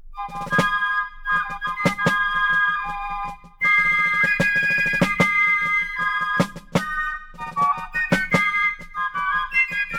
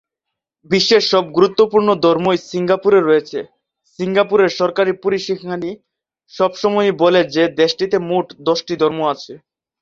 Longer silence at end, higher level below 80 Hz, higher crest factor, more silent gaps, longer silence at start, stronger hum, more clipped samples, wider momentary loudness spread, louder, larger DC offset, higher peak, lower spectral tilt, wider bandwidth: second, 0 s vs 0.45 s; first, -42 dBFS vs -60 dBFS; about the same, 18 dB vs 16 dB; neither; second, 0.05 s vs 0.7 s; neither; neither; about the same, 10 LU vs 11 LU; second, -20 LUFS vs -16 LUFS; neither; about the same, -4 dBFS vs -2 dBFS; about the same, -4.5 dB/octave vs -5 dB/octave; first, 17.5 kHz vs 7.6 kHz